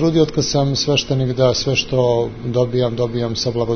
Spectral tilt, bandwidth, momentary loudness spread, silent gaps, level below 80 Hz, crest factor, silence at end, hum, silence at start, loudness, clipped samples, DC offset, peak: -5 dB/octave; 6.6 kHz; 4 LU; none; -40 dBFS; 14 dB; 0 s; none; 0 s; -18 LUFS; under 0.1%; under 0.1%; -2 dBFS